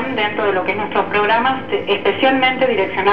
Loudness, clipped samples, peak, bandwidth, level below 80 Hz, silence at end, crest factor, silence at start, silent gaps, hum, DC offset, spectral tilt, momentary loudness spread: -16 LUFS; under 0.1%; 0 dBFS; 18 kHz; -56 dBFS; 0 s; 16 dB; 0 s; none; none; 2%; -7 dB/octave; 5 LU